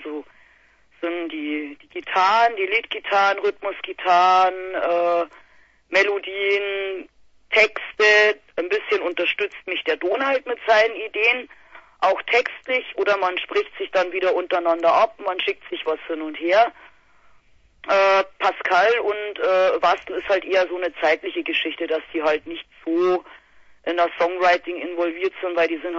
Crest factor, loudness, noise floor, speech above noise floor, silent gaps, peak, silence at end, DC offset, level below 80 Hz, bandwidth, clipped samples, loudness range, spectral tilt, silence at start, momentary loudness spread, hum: 18 dB; -21 LUFS; -57 dBFS; 36 dB; none; -4 dBFS; 0 s; under 0.1%; -64 dBFS; 7.8 kHz; under 0.1%; 3 LU; -3 dB/octave; 0 s; 10 LU; none